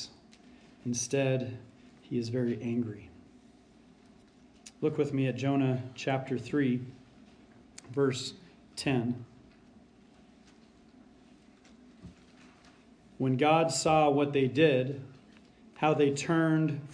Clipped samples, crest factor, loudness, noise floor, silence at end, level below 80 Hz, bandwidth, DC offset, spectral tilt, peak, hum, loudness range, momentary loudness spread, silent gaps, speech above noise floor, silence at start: under 0.1%; 20 dB; -30 LUFS; -59 dBFS; 0 s; -68 dBFS; 10.5 kHz; under 0.1%; -5.5 dB/octave; -12 dBFS; none; 10 LU; 16 LU; none; 30 dB; 0 s